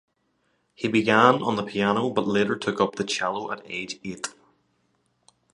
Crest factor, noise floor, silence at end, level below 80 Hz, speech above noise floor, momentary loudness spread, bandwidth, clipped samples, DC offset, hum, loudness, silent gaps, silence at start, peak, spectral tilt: 24 dB; -71 dBFS; 1.25 s; -64 dBFS; 47 dB; 15 LU; 11.5 kHz; under 0.1%; under 0.1%; none; -24 LUFS; none; 0.8 s; -2 dBFS; -4.5 dB/octave